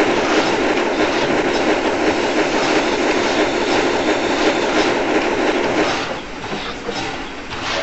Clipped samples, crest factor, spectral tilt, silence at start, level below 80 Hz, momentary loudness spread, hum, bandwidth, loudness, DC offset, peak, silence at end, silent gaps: under 0.1%; 14 dB; -2 dB/octave; 0 s; -40 dBFS; 9 LU; none; 8 kHz; -18 LUFS; 1%; -4 dBFS; 0 s; none